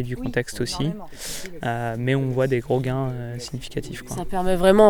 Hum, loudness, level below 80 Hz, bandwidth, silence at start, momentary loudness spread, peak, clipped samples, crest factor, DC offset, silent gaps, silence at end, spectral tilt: none; -25 LUFS; -38 dBFS; 19.5 kHz; 0 s; 10 LU; -4 dBFS; under 0.1%; 20 dB; under 0.1%; none; 0 s; -6 dB/octave